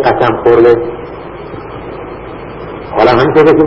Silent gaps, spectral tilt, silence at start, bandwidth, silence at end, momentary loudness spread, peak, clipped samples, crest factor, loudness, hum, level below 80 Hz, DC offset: none; -8 dB/octave; 0 s; 6.6 kHz; 0 s; 19 LU; 0 dBFS; 1%; 10 dB; -9 LUFS; none; -36 dBFS; under 0.1%